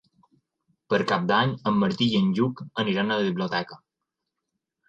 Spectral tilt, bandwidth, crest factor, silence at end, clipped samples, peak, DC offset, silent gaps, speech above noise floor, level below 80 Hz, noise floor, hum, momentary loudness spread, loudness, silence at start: -6.5 dB/octave; 7.8 kHz; 18 dB; 1.15 s; under 0.1%; -8 dBFS; under 0.1%; none; 60 dB; -64 dBFS; -84 dBFS; none; 6 LU; -24 LUFS; 0.9 s